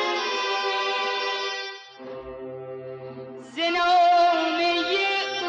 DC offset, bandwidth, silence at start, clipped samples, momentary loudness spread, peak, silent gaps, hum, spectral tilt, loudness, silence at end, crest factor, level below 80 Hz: under 0.1%; 8 kHz; 0 s; under 0.1%; 19 LU; -12 dBFS; none; none; -2.5 dB/octave; -22 LUFS; 0 s; 12 dB; -64 dBFS